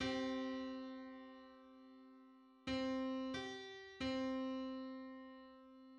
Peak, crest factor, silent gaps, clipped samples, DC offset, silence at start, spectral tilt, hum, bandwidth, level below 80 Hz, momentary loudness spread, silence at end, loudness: -30 dBFS; 16 dB; none; under 0.1%; under 0.1%; 0 s; -5 dB/octave; none; 9.4 kHz; -70 dBFS; 20 LU; 0 s; -45 LUFS